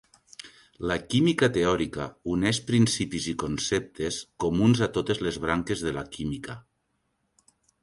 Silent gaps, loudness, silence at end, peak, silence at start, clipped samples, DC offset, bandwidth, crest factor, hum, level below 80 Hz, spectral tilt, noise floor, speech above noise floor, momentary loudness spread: none; -27 LUFS; 1.2 s; -8 dBFS; 0.45 s; under 0.1%; under 0.1%; 11.5 kHz; 20 dB; none; -50 dBFS; -5 dB/octave; -75 dBFS; 49 dB; 14 LU